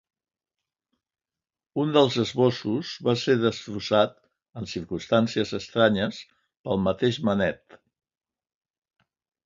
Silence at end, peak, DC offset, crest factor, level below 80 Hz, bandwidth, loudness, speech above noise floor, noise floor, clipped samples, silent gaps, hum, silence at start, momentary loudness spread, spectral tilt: 1.9 s; -6 dBFS; under 0.1%; 22 dB; -58 dBFS; 7.6 kHz; -25 LUFS; over 66 dB; under -90 dBFS; under 0.1%; 6.59-6.64 s; none; 1.75 s; 13 LU; -6 dB/octave